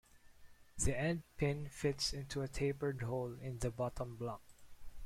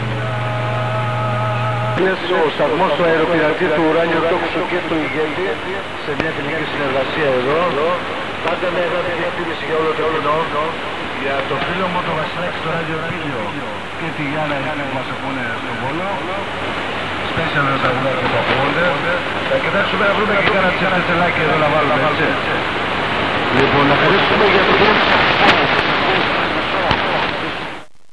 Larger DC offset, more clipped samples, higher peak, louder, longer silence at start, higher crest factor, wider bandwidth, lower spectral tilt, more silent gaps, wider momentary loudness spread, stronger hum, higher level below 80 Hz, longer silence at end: second, under 0.1% vs 2%; neither; second, -20 dBFS vs 0 dBFS; second, -40 LUFS vs -17 LUFS; first, 0.15 s vs 0 s; about the same, 20 dB vs 18 dB; first, 16 kHz vs 11 kHz; about the same, -5 dB/octave vs -5.5 dB/octave; neither; about the same, 8 LU vs 9 LU; neither; second, -52 dBFS vs -44 dBFS; second, 0 s vs 0.25 s